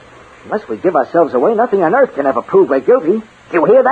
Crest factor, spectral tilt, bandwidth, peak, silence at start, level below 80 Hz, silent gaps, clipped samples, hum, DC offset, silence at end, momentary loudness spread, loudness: 12 dB; -8.5 dB/octave; 7.8 kHz; 0 dBFS; 0.45 s; -56 dBFS; none; under 0.1%; none; under 0.1%; 0 s; 8 LU; -13 LUFS